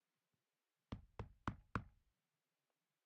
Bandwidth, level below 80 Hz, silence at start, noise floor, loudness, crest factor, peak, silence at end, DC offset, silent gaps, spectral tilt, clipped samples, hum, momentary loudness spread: 7 kHz; -64 dBFS; 0.9 s; under -90 dBFS; -52 LUFS; 28 dB; -26 dBFS; 1.15 s; under 0.1%; none; -6 dB/octave; under 0.1%; none; 8 LU